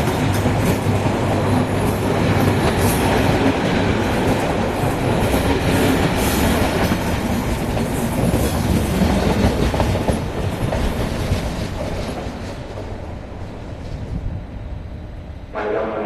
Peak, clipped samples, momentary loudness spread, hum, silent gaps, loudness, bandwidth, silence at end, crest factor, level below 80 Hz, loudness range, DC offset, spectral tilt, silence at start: -2 dBFS; under 0.1%; 14 LU; none; none; -19 LUFS; 14 kHz; 0 s; 16 dB; -28 dBFS; 11 LU; 0.2%; -6 dB/octave; 0 s